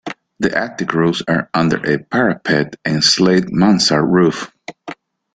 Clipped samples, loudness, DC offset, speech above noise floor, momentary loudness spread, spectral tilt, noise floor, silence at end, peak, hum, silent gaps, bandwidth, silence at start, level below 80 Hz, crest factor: under 0.1%; -15 LUFS; under 0.1%; 20 dB; 19 LU; -4.5 dB/octave; -35 dBFS; 0.4 s; 0 dBFS; none; none; 9.4 kHz; 0.05 s; -52 dBFS; 16 dB